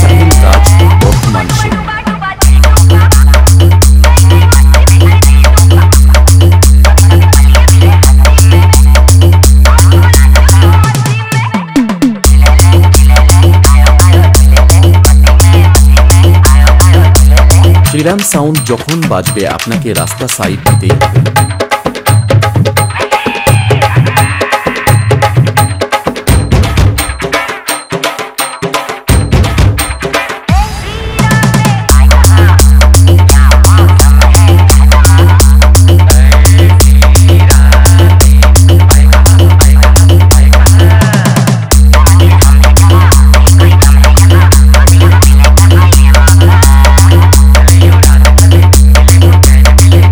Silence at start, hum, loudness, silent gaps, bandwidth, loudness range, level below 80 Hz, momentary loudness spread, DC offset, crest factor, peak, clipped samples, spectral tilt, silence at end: 0 s; none; -5 LUFS; none; over 20 kHz; 6 LU; -6 dBFS; 7 LU; under 0.1%; 4 dB; 0 dBFS; 30%; -5 dB/octave; 0 s